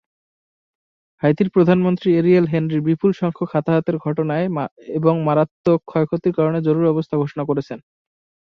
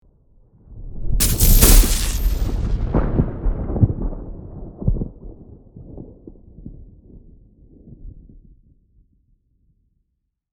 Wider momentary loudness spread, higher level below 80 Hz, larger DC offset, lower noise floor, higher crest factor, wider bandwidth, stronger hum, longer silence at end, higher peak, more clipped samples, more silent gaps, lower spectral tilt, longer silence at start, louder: second, 8 LU vs 29 LU; second, -58 dBFS vs -22 dBFS; neither; first, under -90 dBFS vs -74 dBFS; about the same, 16 dB vs 20 dB; second, 6.2 kHz vs over 20 kHz; neither; second, 0.7 s vs 2.35 s; about the same, -2 dBFS vs 0 dBFS; neither; first, 4.71-4.76 s, 5.51-5.64 s vs none; first, -10 dB/octave vs -4 dB/octave; first, 1.25 s vs 0.7 s; about the same, -19 LUFS vs -19 LUFS